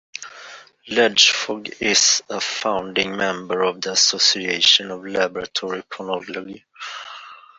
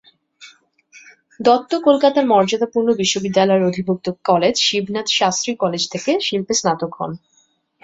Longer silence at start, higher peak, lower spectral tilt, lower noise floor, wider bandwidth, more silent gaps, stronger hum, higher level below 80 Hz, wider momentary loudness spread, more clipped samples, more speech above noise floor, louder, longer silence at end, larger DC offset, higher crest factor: second, 0.15 s vs 0.4 s; about the same, -2 dBFS vs 0 dBFS; second, -0.5 dB/octave vs -3.5 dB/octave; second, -42 dBFS vs -60 dBFS; about the same, 8.2 kHz vs 8 kHz; neither; neither; about the same, -62 dBFS vs -60 dBFS; first, 20 LU vs 7 LU; neither; second, 21 dB vs 43 dB; about the same, -18 LUFS vs -17 LUFS; second, 0.25 s vs 0.65 s; neither; about the same, 20 dB vs 18 dB